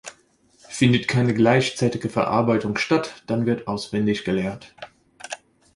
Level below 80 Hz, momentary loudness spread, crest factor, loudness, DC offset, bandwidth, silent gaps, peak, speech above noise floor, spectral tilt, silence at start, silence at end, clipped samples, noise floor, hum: -54 dBFS; 19 LU; 18 dB; -22 LUFS; under 0.1%; 11.5 kHz; none; -4 dBFS; 37 dB; -6 dB/octave; 0.05 s; 0.4 s; under 0.1%; -59 dBFS; none